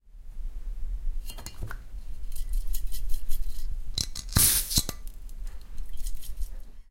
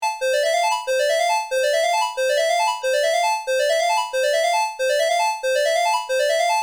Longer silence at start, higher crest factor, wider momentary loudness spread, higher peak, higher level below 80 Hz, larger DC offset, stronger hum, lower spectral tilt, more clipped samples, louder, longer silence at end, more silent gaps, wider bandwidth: about the same, 0.05 s vs 0 s; first, 20 dB vs 10 dB; first, 23 LU vs 2 LU; first, -6 dBFS vs -10 dBFS; first, -32 dBFS vs -68 dBFS; neither; neither; first, -2 dB/octave vs 4 dB/octave; neither; second, -29 LUFS vs -20 LUFS; about the same, 0.1 s vs 0 s; neither; about the same, 17 kHz vs 17 kHz